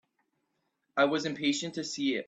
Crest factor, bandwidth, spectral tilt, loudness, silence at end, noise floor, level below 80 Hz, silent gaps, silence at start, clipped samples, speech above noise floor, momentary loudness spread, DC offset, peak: 22 dB; 8.6 kHz; -3.5 dB/octave; -30 LUFS; 0.05 s; -79 dBFS; -76 dBFS; none; 0.95 s; under 0.1%; 49 dB; 7 LU; under 0.1%; -12 dBFS